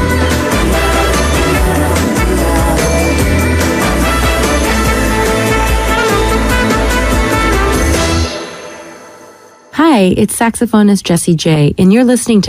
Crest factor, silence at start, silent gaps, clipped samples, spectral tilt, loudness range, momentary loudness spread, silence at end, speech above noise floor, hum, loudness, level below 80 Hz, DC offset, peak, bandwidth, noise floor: 10 dB; 0 s; none; under 0.1%; -5 dB/octave; 2 LU; 3 LU; 0 s; 29 dB; none; -11 LUFS; -18 dBFS; under 0.1%; 0 dBFS; 16 kHz; -38 dBFS